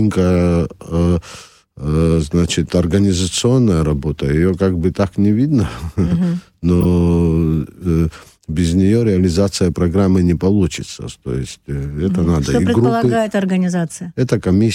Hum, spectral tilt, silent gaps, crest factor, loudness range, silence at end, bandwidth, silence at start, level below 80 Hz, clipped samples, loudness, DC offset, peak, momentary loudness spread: none; -7 dB/octave; none; 12 dB; 2 LU; 0 s; 16.5 kHz; 0 s; -30 dBFS; under 0.1%; -16 LUFS; under 0.1%; -4 dBFS; 10 LU